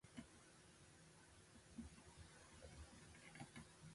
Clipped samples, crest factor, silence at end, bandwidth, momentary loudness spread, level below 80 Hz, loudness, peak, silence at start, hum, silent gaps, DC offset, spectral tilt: under 0.1%; 20 dB; 0 s; 11.5 kHz; 7 LU; -70 dBFS; -62 LUFS; -42 dBFS; 0.05 s; none; none; under 0.1%; -4 dB/octave